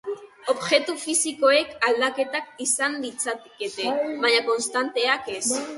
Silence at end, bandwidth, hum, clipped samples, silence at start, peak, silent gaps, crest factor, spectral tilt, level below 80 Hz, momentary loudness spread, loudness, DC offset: 0 s; 12 kHz; none; under 0.1%; 0.05 s; -4 dBFS; none; 20 dB; -0.5 dB/octave; -70 dBFS; 9 LU; -23 LUFS; under 0.1%